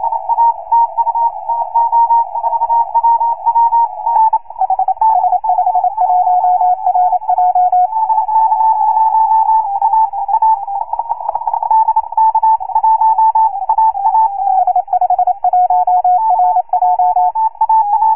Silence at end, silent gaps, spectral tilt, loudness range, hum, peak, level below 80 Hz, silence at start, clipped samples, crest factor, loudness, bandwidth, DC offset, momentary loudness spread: 0 s; none; -8 dB/octave; 1 LU; none; -4 dBFS; -54 dBFS; 0 s; under 0.1%; 8 dB; -12 LUFS; 2.8 kHz; 1%; 4 LU